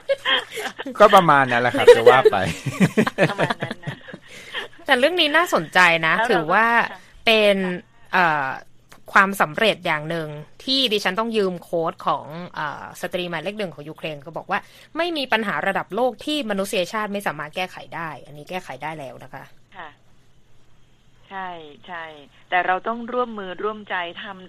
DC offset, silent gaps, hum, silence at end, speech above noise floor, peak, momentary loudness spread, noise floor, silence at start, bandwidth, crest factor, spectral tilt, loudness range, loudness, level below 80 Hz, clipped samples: under 0.1%; none; none; 0 s; 30 dB; 0 dBFS; 19 LU; -51 dBFS; 0.1 s; 15 kHz; 22 dB; -4.5 dB/octave; 17 LU; -20 LUFS; -56 dBFS; under 0.1%